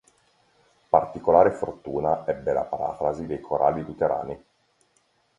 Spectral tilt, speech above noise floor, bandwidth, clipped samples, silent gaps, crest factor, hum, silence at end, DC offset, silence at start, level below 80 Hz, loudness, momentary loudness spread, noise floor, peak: -8.5 dB/octave; 43 dB; 10 kHz; under 0.1%; none; 22 dB; none; 1 s; under 0.1%; 0.95 s; -54 dBFS; -24 LUFS; 12 LU; -67 dBFS; -2 dBFS